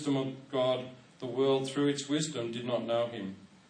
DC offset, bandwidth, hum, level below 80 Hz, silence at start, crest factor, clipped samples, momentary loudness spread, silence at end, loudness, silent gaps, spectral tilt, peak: under 0.1%; 10 kHz; none; -78 dBFS; 0 s; 14 dB; under 0.1%; 12 LU; 0.25 s; -32 LUFS; none; -5 dB/octave; -18 dBFS